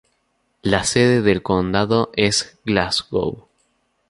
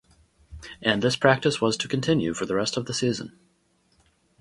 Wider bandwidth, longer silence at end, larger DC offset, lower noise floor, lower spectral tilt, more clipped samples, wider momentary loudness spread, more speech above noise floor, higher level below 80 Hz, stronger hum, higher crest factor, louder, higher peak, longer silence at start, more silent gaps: about the same, 11.5 kHz vs 11.5 kHz; second, 0.7 s vs 1.1 s; neither; about the same, -68 dBFS vs -66 dBFS; about the same, -4.5 dB/octave vs -4.5 dB/octave; neither; second, 8 LU vs 14 LU; first, 49 dB vs 42 dB; first, -44 dBFS vs -54 dBFS; neither; second, 18 dB vs 24 dB; first, -19 LUFS vs -24 LUFS; about the same, -2 dBFS vs -2 dBFS; first, 0.65 s vs 0.5 s; neither